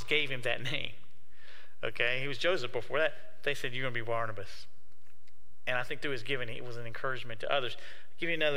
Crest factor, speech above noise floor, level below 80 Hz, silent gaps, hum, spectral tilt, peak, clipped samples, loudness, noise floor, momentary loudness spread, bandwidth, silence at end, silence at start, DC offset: 22 dB; 32 dB; -66 dBFS; none; none; -4.5 dB/octave; -12 dBFS; under 0.1%; -34 LUFS; -67 dBFS; 12 LU; 16 kHz; 0 s; 0 s; 3%